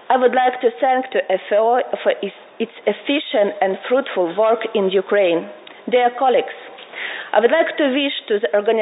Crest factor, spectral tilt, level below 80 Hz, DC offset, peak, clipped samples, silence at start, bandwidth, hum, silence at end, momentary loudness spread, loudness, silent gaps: 16 dB; -9.5 dB/octave; -78 dBFS; under 0.1%; -2 dBFS; under 0.1%; 0.1 s; 4 kHz; none; 0 s; 12 LU; -18 LUFS; none